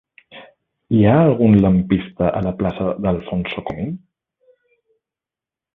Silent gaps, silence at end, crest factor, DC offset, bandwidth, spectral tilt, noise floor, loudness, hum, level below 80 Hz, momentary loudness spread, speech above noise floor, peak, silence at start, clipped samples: none; 1.8 s; 18 dB; under 0.1%; 4 kHz; -11 dB/octave; -89 dBFS; -17 LUFS; none; -40 dBFS; 13 LU; 72 dB; -2 dBFS; 0.35 s; under 0.1%